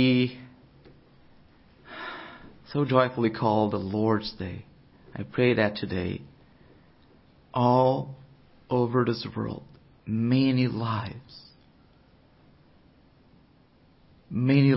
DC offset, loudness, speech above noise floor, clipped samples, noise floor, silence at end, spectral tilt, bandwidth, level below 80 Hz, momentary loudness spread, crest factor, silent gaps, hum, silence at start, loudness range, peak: under 0.1%; -26 LUFS; 35 dB; under 0.1%; -59 dBFS; 0 s; -11 dB/octave; 5.8 kHz; -56 dBFS; 21 LU; 20 dB; none; none; 0 s; 4 LU; -8 dBFS